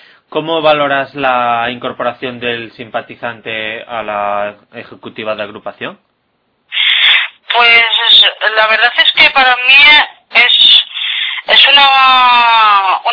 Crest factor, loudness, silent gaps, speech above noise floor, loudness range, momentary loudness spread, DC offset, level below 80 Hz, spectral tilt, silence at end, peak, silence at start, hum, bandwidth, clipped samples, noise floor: 10 dB; -7 LUFS; none; 50 dB; 15 LU; 18 LU; under 0.1%; -52 dBFS; -3 dB/octave; 0 s; 0 dBFS; 0.3 s; none; 5.4 kHz; 0.9%; -61 dBFS